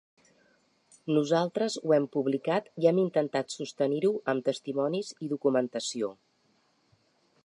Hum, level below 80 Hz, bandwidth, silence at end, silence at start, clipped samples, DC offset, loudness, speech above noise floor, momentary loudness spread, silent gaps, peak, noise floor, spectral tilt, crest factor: none; -82 dBFS; 11 kHz; 1.3 s; 1.05 s; under 0.1%; under 0.1%; -29 LUFS; 41 dB; 8 LU; none; -10 dBFS; -70 dBFS; -5.5 dB/octave; 20 dB